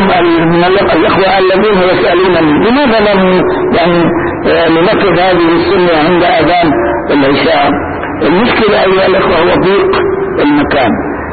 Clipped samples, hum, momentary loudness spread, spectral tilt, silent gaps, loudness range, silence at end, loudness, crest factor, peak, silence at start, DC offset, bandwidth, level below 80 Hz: under 0.1%; none; 4 LU; -12 dB/octave; none; 1 LU; 0 s; -8 LUFS; 6 dB; 0 dBFS; 0 s; 1%; 4.8 kHz; -32 dBFS